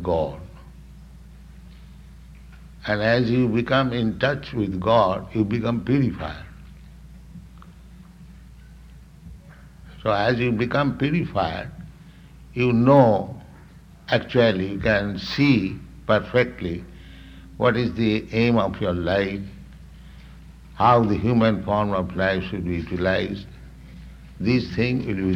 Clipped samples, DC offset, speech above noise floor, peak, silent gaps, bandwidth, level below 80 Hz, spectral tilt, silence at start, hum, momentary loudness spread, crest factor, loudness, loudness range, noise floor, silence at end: under 0.1%; under 0.1%; 25 dB; -2 dBFS; none; 9.6 kHz; -44 dBFS; -8 dB/octave; 0 s; none; 21 LU; 22 dB; -22 LUFS; 7 LU; -46 dBFS; 0 s